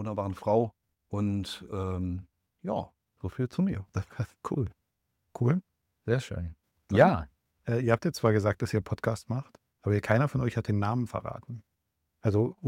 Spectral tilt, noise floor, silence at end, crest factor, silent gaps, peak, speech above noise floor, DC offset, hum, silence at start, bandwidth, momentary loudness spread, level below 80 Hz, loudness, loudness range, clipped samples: -7.5 dB/octave; -80 dBFS; 0 s; 20 dB; none; -10 dBFS; 52 dB; under 0.1%; none; 0 s; 14 kHz; 15 LU; -54 dBFS; -30 LUFS; 6 LU; under 0.1%